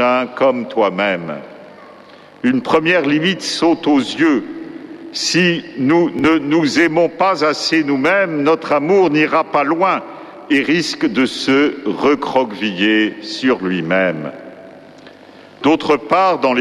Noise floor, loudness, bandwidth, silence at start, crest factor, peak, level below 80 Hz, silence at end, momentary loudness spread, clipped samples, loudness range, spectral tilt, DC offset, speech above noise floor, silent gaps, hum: -41 dBFS; -15 LUFS; 12 kHz; 0 s; 14 dB; -2 dBFS; -56 dBFS; 0 s; 8 LU; under 0.1%; 3 LU; -4.5 dB/octave; under 0.1%; 26 dB; none; none